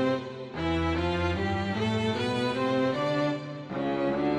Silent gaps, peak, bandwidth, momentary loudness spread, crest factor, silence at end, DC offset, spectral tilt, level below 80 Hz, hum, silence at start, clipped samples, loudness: none; -16 dBFS; 11.5 kHz; 6 LU; 12 dB; 0 s; under 0.1%; -6.5 dB/octave; -50 dBFS; none; 0 s; under 0.1%; -29 LUFS